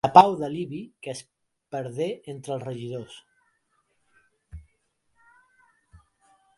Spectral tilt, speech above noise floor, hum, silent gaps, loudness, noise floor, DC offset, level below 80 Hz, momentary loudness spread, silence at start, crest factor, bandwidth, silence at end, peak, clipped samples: -6 dB/octave; 49 dB; none; none; -26 LUFS; -72 dBFS; under 0.1%; -58 dBFS; 28 LU; 0.05 s; 28 dB; 11.5 kHz; 2 s; 0 dBFS; under 0.1%